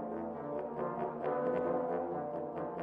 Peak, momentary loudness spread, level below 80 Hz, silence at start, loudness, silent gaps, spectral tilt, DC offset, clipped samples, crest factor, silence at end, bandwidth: -22 dBFS; 6 LU; -70 dBFS; 0 s; -37 LUFS; none; -10 dB/octave; under 0.1%; under 0.1%; 14 dB; 0 s; 3.9 kHz